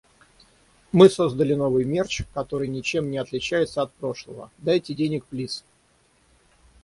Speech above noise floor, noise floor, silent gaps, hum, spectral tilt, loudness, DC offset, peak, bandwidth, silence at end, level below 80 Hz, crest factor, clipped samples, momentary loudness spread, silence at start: 39 dB; -62 dBFS; none; none; -6 dB/octave; -23 LUFS; under 0.1%; -2 dBFS; 11.5 kHz; 1.25 s; -52 dBFS; 22 dB; under 0.1%; 16 LU; 0.95 s